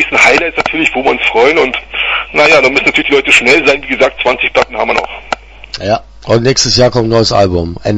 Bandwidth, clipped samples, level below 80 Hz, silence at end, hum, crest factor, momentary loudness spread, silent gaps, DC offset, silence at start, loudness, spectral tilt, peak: 11 kHz; 0.5%; -34 dBFS; 0 s; none; 10 dB; 10 LU; none; under 0.1%; 0 s; -9 LUFS; -3.5 dB/octave; 0 dBFS